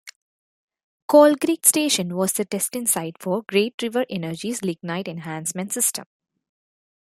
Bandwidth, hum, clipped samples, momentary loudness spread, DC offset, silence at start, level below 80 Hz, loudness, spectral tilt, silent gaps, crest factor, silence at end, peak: 16.5 kHz; none; under 0.1%; 13 LU; under 0.1%; 0.05 s; -70 dBFS; -21 LUFS; -3.5 dB/octave; 0.16-0.68 s, 0.84-1.08 s, 3.74-3.78 s; 22 dB; 1 s; 0 dBFS